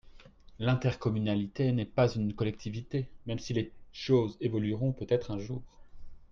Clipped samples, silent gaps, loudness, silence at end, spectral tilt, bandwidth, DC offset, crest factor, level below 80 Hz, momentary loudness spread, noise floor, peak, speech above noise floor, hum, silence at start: under 0.1%; none; -32 LUFS; 0.05 s; -7.5 dB/octave; 7.2 kHz; under 0.1%; 18 dB; -54 dBFS; 10 LU; -53 dBFS; -14 dBFS; 22 dB; none; 0.05 s